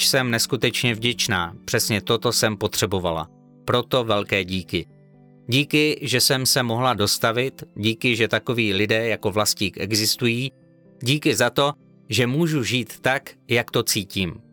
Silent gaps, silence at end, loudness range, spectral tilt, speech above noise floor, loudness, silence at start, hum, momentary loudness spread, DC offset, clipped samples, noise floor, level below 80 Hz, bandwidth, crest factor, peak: none; 0.1 s; 3 LU; -3.5 dB/octave; 28 dB; -21 LUFS; 0 s; none; 7 LU; under 0.1%; under 0.1%; -50 dBFS; -54 dBFS; 19 kHz; 16 dB; -6 dBFS